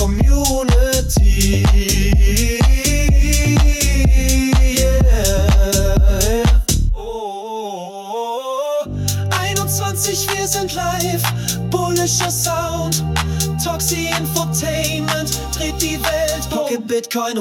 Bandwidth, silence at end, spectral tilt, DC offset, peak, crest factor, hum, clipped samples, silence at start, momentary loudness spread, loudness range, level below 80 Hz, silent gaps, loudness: 17.5 kHz; 0 s; -4 dB/octave; under 0.1%; -2 dBFS; 14 dB; none; under 0.1%; 0 s; 7 LU; 5 LU; -18 dBFS; none; -17 LUFS